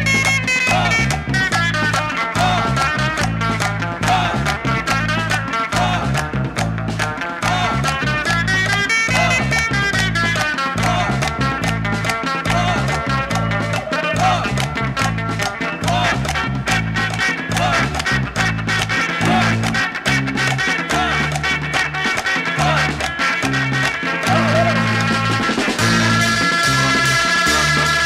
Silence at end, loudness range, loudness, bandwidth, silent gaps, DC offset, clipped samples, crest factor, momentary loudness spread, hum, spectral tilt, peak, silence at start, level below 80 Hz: 0 s; 3 LU; -17 LUFS; 16 kHz; none; under 0.1%; under 0.1%; 14 dB; 5 LU; none; -4 dB/octave; -4 dBFS; 0 s; -34 dBFS